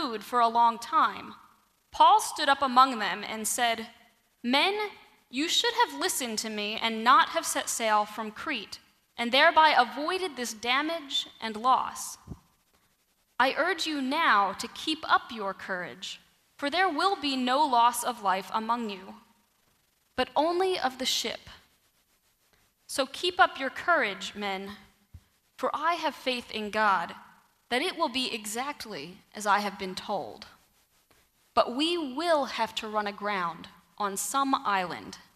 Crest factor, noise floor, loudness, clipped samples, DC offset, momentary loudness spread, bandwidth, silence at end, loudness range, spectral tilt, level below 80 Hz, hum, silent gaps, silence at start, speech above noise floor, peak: 22 dB; -71 dBFS; -27 LUFS; under 0.1%; under 0.1%; 15 LU; 15 kHz; 0.2 s; 6 LU; -2 dB/octave; -66 dBFS; none; none; 0 s; 43 dB; -6 dBFS